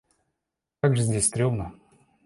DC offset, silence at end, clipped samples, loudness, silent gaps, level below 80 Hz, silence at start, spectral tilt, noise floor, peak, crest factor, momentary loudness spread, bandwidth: under 0.1%; 0.55 s; under 0.1%; -24 LUFS; none; -50 dBFS; 0.85 s; -5 dB/octave; -85 dBFS; -8 dBFS; 20 dB; 9 LU; 11.5 kHz